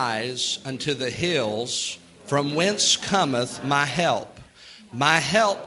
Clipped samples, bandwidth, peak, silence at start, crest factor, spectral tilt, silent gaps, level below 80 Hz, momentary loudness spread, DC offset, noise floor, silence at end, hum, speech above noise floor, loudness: under 0.1%; 12 kHz; -2 dBFS; 0 s; 22 dB; -3 dB/octave; none; -60 dBFS; 9 LU; under 0.1%; -48 dBFS; 0 s; none; 24 dB; -23 LUFS